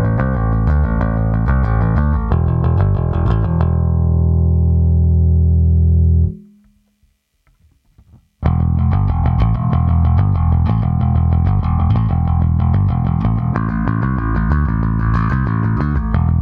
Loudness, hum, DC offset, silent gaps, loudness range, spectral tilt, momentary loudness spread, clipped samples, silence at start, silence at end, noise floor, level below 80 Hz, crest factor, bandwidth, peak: -16 LUFS; none; under 0.1%; none; 4 LU; -11.5 dB/octave; 4 LU; under 0.1%; 0 s; 0 s; -60 dBFS; -20 dBFS; 14 dB; 3.5 kHz; 0 dBFS